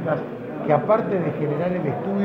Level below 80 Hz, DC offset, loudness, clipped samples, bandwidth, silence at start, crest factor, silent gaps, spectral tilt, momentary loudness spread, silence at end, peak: -60 dBFS; under 0.1%; -23 LUFS; under 0.1%; 6 kHz; 0 s; 18 dB; none; -10 dB/octave; 8 LU; 0 s; -6 dBFS